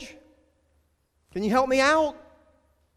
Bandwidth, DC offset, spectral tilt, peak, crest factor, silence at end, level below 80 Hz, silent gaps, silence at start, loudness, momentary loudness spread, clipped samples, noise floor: 15.5 kHz; under 0.1%; -4 dB/octave; -10 dBFS; 18 dB; 0.8 s; -56 dBFS; none; 0 s; -23 LUFS; 17 LU; under 0.1%; -69 dBFS